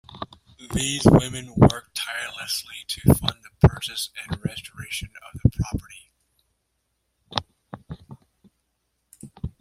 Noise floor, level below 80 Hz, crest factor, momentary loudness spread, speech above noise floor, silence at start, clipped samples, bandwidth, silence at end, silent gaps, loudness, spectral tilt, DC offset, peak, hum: -75 dBFS; -40 dBFS; 24 dB; 21 LU; 53 dB; 0.1 s; under 0.1%; 16 kHz; 0.15 s; none; -23 LUFS; -5.5 dB/octave; under 0.1%; -2 dBFS; none